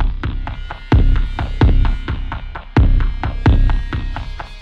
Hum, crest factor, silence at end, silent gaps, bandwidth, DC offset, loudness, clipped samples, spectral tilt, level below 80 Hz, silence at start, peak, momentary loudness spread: none; 14 dB; 0 s; none; 5.2 kHz; under 0.1%; -19 LUFS; under 0.1%; -8.5 dB/octave; -16 dBFS; 0 s; -2 dBFS; 13 LU